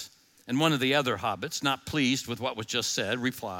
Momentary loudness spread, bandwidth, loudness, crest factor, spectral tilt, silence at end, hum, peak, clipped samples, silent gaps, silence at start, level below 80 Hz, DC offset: 8 LU; 17 kHz; -28 LUFS; 18 dB; -3.5 dB/octave; 0 s; none; -10 dBFS; under 0.1%; none; 0 s; -66 dBFS; under 0.1%